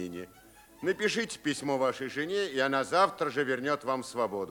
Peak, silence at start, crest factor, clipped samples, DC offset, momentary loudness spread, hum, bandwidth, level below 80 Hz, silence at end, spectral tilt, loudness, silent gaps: -10 dBFS; 0 s; 20 dB; under 0.1%; under 0.1%; 8 LU; none; over 20 kHz; -70 dBFS; 0 s; -4 dB/octave; -30 LUFS; none